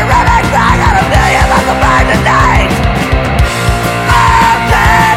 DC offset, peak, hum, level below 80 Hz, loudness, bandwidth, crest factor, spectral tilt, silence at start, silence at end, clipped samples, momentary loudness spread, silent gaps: under 0.1%; 0 dBFS; none; -16 dBFS; -8 LUFS; 16.5 kHz; 8 dB; -5 dB/octave; 0 s; 0 s; 0.6%; 5 LU; none